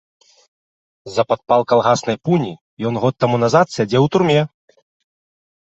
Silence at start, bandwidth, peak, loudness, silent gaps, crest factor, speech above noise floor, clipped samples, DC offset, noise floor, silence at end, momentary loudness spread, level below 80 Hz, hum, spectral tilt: 1.05 s; 8.2 kHz; 0 dBFS; -17 LUFS; 2.61-2.77 s; 18 dB; over 74 dB; under 0.1%; under 0.1%; under -90 dBFS; 1.3 s; 9 LU; -56 dBFS; none; -6 dB/octave